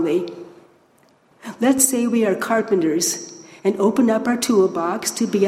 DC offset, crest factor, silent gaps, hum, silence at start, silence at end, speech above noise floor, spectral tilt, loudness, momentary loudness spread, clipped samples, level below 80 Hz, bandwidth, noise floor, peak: under 0.1%; 18 dB; none; none; 0 s; 0 s; 38 dB; -3.5 dB/octave; -19 LUFS; 15 LU; under 0.1%; -64 dBFS; 16 kHz; -56 dBFS; 0 dBFS